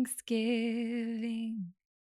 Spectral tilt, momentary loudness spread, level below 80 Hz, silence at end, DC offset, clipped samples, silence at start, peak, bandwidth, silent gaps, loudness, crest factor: -4.5 dB/octave; 9 LU; -86 dBFS; 0.5 s; under 0.1%; under 0.1%; 0 s; -20 dBFS; 14.5 kHz; none; -34 LUFS; 14 dB